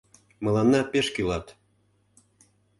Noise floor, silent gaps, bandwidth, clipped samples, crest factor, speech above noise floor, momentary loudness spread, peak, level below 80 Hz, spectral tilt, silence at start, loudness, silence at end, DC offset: -67 dBFS; none; 11.5 kHz; under 0.1%; 18 dB; 43 dB; 10 LU; -10 dBFS; -50 dBFS; -5.5 dB/octave; 0.4 s; -25 LUFS; 1.3 s; under 0.1%